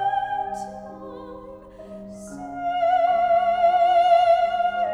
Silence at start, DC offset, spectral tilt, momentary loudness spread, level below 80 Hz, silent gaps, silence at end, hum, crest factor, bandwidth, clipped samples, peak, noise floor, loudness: 0 s; under 0.1%; -4.5 dB/octave; 22 LU; -56 dBFS; none; 0 s; none; 14 dB; 10 kHz; under 0.1%; -8 dBFS; -41 dBFS; -20 LUFS